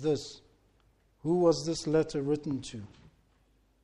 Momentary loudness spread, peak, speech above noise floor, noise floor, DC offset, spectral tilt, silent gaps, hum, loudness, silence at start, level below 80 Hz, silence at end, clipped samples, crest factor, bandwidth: 19 LU; -12 dBFS; 38 dB; -68 dBFS; under 0.1%; -6 dB/octave; none; none; -30 LUFS; 0 s; -60 dBFS; 1 s; under 0.1%; 20 dB; 11.5 kHz